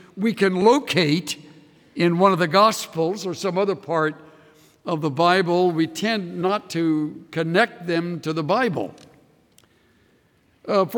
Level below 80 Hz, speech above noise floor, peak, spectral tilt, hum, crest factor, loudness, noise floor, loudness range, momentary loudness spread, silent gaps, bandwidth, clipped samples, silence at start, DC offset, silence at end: -70 dBFS; 40 dB; -4 dBFS; -5.5 dB/octave; none; 18 dB; -21 LUFS; -61 dBFS; 5 LU; 11 LU; none; 19 kHz; under 0.1%; 0.15 s; under 0.1%; 0 s